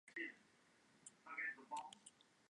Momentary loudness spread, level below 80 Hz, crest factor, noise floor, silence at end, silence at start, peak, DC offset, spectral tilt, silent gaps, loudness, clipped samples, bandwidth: 17 LU; under -90 dBFS; 18 dB; -74 dBFS; 0.3 s; 0.05 s; -36 dBFS; under 0.1%; -1.5 dB/octave; none; -50 LUFS; under 0.1%; 11 kHz